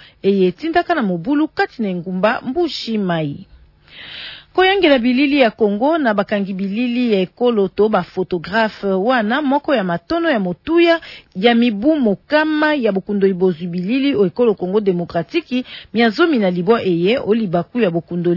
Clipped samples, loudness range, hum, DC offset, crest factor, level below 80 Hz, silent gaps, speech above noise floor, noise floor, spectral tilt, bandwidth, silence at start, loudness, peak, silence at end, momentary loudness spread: under 0.1%; 3 LU; none; under 0.1%; 16 dB; -52 dBFS; none; 26 dB; -42 dBFS; -7.5 dB/octave; 6 kHz; 0.25 s; -17 LUFS; -2 dBFS; 0 s; 8 LU